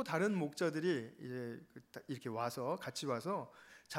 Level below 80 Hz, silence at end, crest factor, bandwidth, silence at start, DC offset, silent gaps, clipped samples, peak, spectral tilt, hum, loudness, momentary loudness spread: -86 dBFS; 0 s; 20 dB; 16 kHz; 0 s; under 0.1%; none; under 0.1%; -20 dBFS; -5.5 dB/octave; none; -40 LUFS; 18 LU